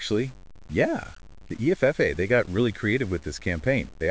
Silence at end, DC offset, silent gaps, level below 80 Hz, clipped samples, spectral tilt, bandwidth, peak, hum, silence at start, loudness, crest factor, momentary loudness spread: 0 s; 0.4%; none; -44 dBFS; under 0.1%; -6.5 dB/octave; 8 kHz; -8 dBFS; none; 0 s; -25 LUFS; 18 dB; 10 LU